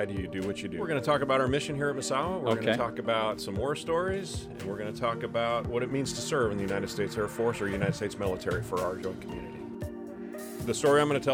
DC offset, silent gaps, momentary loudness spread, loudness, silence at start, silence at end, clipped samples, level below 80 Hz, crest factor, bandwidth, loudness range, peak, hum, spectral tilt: under 0.1%; none; 13 LU; -30 LUFS; 0 s; 0 s; under 0.1%; -54 dBFS; 20 dB; 17 kHz; 4 LU; -10 dBFS; none; -5 dB/octave